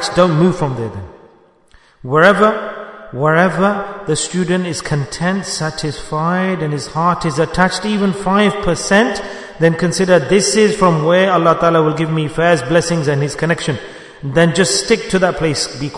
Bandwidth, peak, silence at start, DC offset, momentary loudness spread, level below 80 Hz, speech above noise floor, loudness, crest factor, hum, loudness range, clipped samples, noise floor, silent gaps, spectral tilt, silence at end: 11 kHz; 0 dBFS; 0 s; under 0.1%; 10 LU; -40 dBFS; 35 dB; -14 LUFS; 14 dB; none; 5 LU; 0.1%; -49 dBFS; none; -5 dB/octave; 0 s